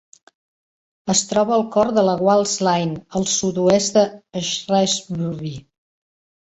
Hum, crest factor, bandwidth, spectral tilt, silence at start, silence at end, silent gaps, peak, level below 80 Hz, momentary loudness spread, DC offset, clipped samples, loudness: none; 18 dB; 8.4 kHz; -4 dB/octave; 1.05 s; 0.85 s; none; -4 dBFS; -56 dBFS; 10 LU; under 0.1%; under 0.1%; -19 LUFS